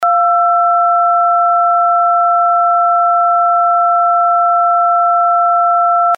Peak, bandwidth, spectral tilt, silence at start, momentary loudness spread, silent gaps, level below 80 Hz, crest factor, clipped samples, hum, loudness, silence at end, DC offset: -4 dBFS; 2.6 kHz; -2 dB/octave; 0 s; 0 LU; none; -84 dBFS; 6 dB; under 0.1%; none; -11 LUFS; 0 s; under 0.1%